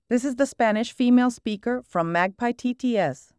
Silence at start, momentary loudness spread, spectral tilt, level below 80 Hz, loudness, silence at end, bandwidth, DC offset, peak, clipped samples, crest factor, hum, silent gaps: 0.1 s; 7 LU; -5.5 dB/octave; -62 dBFS; -24 LUFS; 0.25 s; 11 kHz; under 0.1%; -8 dBFS; under 0.1%; 16 dB; none; none